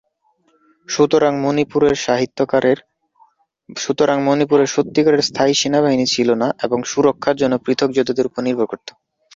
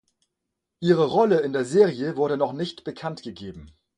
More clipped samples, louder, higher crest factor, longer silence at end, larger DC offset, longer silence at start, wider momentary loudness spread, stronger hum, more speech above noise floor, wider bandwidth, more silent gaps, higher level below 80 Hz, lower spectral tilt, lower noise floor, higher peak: neither; first, -17 LUFS vs -23 LUFS; about the same, 16 dB vs 18 dB; first, 0.45 s vs 0.3 s; neither; about the same, 0.9 s vs 0.8 s; second, 7 LU vs 17 LU; neither; second, 46 dB vs 59 dB; second, 7.8 kHz vs 10.5 kHz; neither; about the same, -56 dBFS vs -60 dBFS; second, -4.5 dB/octave vs -6.5 dB/octave; second, -62 dBFS vs -82 dBFS; first, -2 dBFS vs -6 dBFS